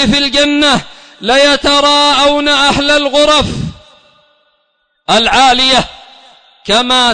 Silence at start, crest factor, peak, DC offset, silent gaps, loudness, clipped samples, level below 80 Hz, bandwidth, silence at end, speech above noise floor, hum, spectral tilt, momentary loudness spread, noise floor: 0 s; 10 dB; 0 dBFS; under 0.1%; none; -9 LUFS; under 0.1%; -34 dBFS; 9.6 kHz; 0 s; 52 dB; none; -3 dB/octave; 13 LU; -61 dBFS